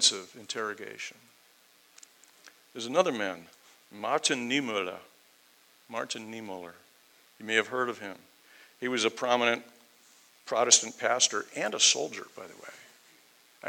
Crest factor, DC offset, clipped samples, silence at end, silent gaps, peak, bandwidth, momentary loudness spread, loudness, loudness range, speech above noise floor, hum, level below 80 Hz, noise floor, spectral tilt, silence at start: 28 dB; under 0.1%; under 0.1%; 0 s; none; -4 dBFS; 20 kHz; 23 LU; -28 LUFS; 9 LU; 32 dB; none; -88 dBFS; -62 dBFS; -0.5 dB/octave; 0 s